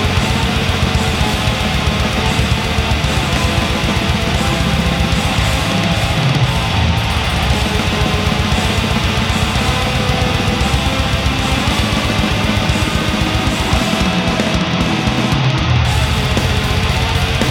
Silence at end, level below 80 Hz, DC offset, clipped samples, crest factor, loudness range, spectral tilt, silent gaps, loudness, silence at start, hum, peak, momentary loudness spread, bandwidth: 0 s; -22 dBFS; under 0.1%; under 0.1%; 14 dB; 0 LU; -5 dB/octave; none; -15 LUFS; 0 s; none; 0 dBFS; 1 LU; 17 kHz